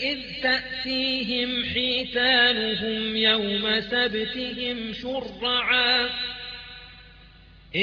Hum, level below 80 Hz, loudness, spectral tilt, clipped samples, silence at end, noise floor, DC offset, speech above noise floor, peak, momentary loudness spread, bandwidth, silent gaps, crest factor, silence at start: none; -52 dBFS; -23 LUFS; -5 dB/octave; under 0.1%; 0 s; -50 dBFS; under 0.1%; 25 dB; -8 dBFS; 12 LU; 7.4 kHz; none; 18 dB; 0 s